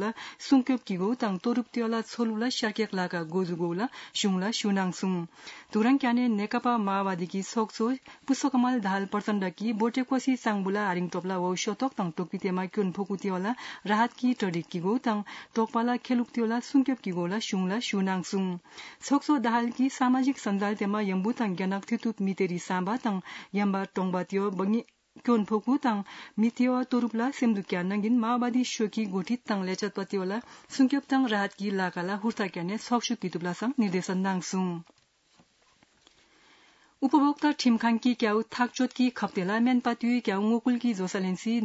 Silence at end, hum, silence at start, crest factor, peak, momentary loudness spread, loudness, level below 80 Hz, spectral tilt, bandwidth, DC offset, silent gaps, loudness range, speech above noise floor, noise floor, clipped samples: 0 s; none; 0 s; 16 dB; -12 dBFS; 6 LU; -28 LUFS; -78 dBFS; -5.5 dB/octave; 8 kHz; under 0.1%; none; 3 LU; 37 dB; -65 dBFS; under 0.1%